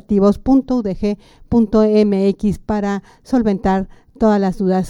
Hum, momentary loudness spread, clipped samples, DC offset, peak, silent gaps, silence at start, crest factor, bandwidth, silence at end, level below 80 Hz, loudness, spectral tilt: none; 9 LU; under 0.1%; under 0.1%; -2 dBFS; none; 0.1 s; 14 dB; 10.5 kHz; 0 s; -36 dBFS; -17 LUFS; -8 dB/octave